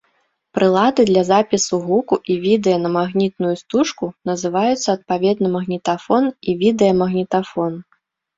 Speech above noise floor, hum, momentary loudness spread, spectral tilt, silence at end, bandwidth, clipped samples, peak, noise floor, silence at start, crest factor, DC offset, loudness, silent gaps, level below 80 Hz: 48 dB; none; 8 LU; -5.5 dB/octave; 0.55 s; 7.8 kHz; under 0.1%; -2 dBFS; -65 dBFS; 0.55 s; 16 dB; under 0.1%; -18 LUFS; none; -56 dBFS